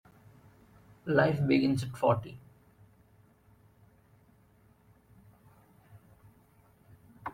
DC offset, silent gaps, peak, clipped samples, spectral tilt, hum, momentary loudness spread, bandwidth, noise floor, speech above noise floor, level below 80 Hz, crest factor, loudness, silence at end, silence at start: under 0.1%; none; -12 dBFS; under 0.1%; -7.5 dB/octave; none; 20 LU; 15.5 kHz; -63 dBFS; 36 dB; -66 dBFS; 24 dB; -29 LUFS; 0.05 s; 1.05 s